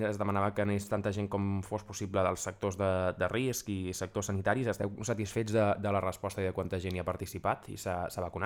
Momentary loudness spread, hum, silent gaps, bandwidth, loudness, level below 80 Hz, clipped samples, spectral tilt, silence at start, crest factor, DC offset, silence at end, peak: 5 LU; none; none; 17.5 kHz; -33 LUFS; -58 dBFS; under 0.1%; -5.5 dB/octave; 0 s; 20 dB; under 0.1%; 0 s; -14 dBFS